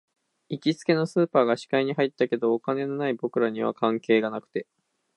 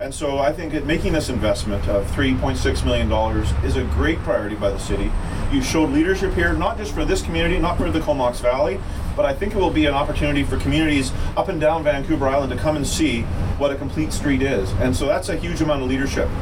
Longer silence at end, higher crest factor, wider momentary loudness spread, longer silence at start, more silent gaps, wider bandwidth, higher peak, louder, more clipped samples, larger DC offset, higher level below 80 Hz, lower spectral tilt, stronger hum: first, 0.55 s vs 0 s; about the same, 18 dB vs 14 dB; about the same, 7 LU vs 5 LU; first, 0.5 s vs 0 s; neither; second, 11 kHz vs 16.5 kHz; about the same, -6 dBFS vs -6 dBFS; second, -25 LUFS vs -21 LUFS; neither; second, under 0.1% vs 0.7%; second, -78 dBFS vs -26 dBFS; about the same, -6.5 dB/octave vs -5.5 dB/octave; neither